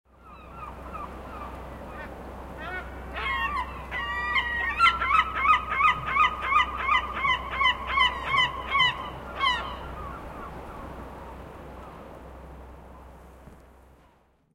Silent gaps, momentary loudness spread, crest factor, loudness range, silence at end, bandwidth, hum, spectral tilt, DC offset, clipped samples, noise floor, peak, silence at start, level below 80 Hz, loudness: none; 21 LU; 22 dB; 20 LU; 0.8 s; 16.5 kHz; none; -3.5 dB/octave; under 0.1%; under 0.1%; -62 dBFS; -8 dBFS; 0.2 s; -44 dBFS; -24 LUFS